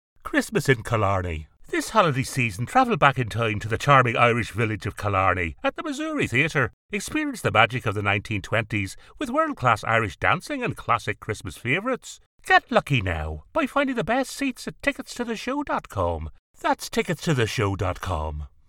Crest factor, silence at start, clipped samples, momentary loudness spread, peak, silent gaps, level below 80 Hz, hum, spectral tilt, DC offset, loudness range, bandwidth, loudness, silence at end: 24 dB; 0.25 s; under 0.1%; 10 LU; 0 dBFS; 6.73-6.89 s, 12.26-12.38 s, 16.39-16.54 s; -44 dBFS; none; -5 dB/octave; under 0.1%; 5 LU; 17 kHz; -24 LUFS; 0.2 s